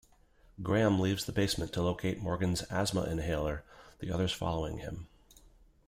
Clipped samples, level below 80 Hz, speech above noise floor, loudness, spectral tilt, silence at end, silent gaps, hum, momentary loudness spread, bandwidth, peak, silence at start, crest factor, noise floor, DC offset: under 0.1%; -50 dBFS; 30 dB; -33 LUFS; -5.5 dB/octave; 0.8 s; none; none; 14 LU; 16 kHz; -14 dBFS; 0.6 s; 18 dB; -63 dBFS; under 0.1%